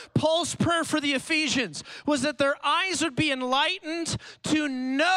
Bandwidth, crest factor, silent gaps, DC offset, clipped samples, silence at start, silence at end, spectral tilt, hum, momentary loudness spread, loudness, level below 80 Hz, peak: 15 kHz; 14 dB; none; under 0.1%; under 0.1%; 0 s; 0 s; -3.5 dB/octave; none; 6 LU; -25 LUFS; -58 dBFS; -12 dBFS